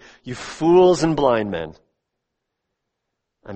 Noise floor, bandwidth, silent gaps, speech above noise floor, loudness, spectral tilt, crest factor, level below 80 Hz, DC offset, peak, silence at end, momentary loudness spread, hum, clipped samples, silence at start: -79 dBFS; 8.8 kHz; none; 61 dB; -17 LUFS; -6 dB/octave; 18 dB; -50 dBFS; under 0.1%; -2 dBFS; 0 s; 20 LU; none; under 0.1%; 0.25 s